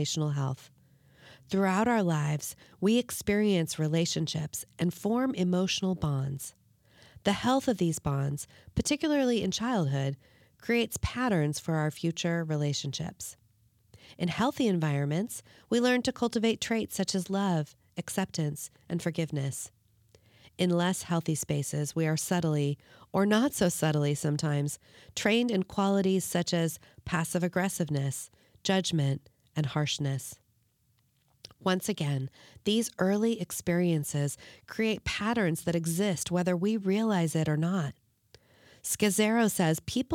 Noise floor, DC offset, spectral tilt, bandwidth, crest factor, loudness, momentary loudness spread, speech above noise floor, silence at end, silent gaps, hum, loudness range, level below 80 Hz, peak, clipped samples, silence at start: -71 dBFS; under 0.1%; -5 dB/octave; 18 kHz; 18 dB; -30 LUFS; 10 LU; 42 dB; 0 s; none; none; 4 LU; -58 dBFS; -12 dBFS; under 0.1%; 0 s